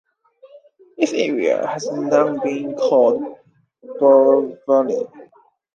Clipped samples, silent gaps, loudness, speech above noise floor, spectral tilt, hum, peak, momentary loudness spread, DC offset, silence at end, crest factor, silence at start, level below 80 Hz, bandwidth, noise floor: under 0.1%; none; -18 LUFS; 36 dB; -5 dB/octave; none; -2 dBFS; 12 LU; under 0.1%; 0.5 s; 16 dB; 0.45 s; -74 dBFS; 7.4 kHz; -53 dBFS